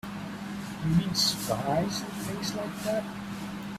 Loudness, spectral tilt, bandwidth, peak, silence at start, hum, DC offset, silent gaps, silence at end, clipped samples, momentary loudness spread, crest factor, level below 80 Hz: -30 LUFS; -4.5 dB/octave; 16 kHz; -12 dBFS; 0.05 s; none; under 0.1%; none; 0 s; under 0.1%; 12 LU; 18 dB; -54 dBFS